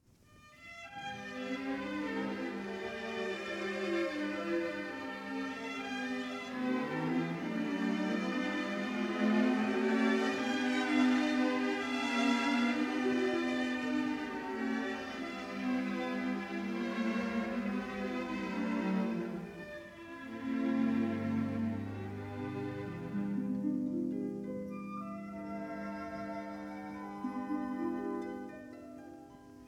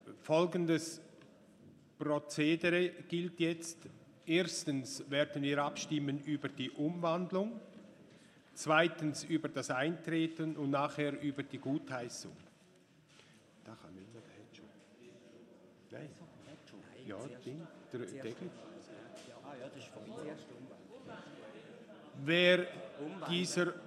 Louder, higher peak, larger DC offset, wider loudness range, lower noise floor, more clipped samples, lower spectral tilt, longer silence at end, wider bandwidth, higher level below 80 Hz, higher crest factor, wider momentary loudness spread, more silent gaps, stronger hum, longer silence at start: about the same, -36 LUFS vs -36 LUFS; second, -18 dBFS vs -14 dBFS; neither; second, 9 LU vs 19 LU; second, -61 dBFS vs -65 dBFS; neither; about the same, -5.5 dB/octave vs -4.5 dB/octave; about the same, 0 s vs 0 s; second, 12 kHz vs 13.5 kHz; first, -68 dBFS vs -84 dBFS; second, 18 dB vs 24 dB; second, 12 LU vs 22 LU; neither; neither; first, 0.3 s vs 0.05 s